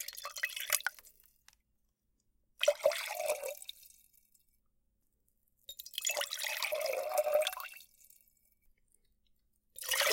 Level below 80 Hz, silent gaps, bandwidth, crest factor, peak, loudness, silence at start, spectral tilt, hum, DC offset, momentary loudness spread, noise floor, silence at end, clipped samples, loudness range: -78 dBFS; none; 17 kHz; 34 dB; -6 dBFS; -35 LUFS; 0 s; 2.5 dB/octave; none; under 0.1%; 17 LU; -79 dBFS; 0 s; under 0.1%; 5 LU